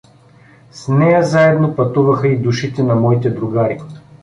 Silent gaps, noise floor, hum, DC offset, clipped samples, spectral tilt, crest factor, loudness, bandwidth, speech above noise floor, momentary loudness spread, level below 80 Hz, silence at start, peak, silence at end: none; -45 dBFS; none; under 0.1%; under 0.1%; -7.5 dB/octave; 14 dB; -14 LUFS; 10.5 kHz; 32 dB; 8 LU; -50 dBFS; 0.75 s; -2 dBFS; 0.25 s